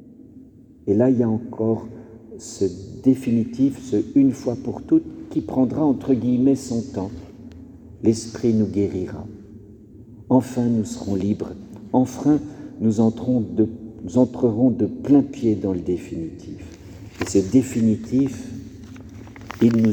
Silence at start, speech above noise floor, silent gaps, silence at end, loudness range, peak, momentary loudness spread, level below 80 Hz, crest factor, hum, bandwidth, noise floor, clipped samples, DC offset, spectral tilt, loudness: 0 s; 25 dB; none; 0 s; 3 LU; -4 dBFS; 20 LU; -50 dBFS; 18 dB; none; 9.6 kHz; -46 dBFS; under 0.1%; under 0.1%; -7.5 dB/octave; -21 LUFS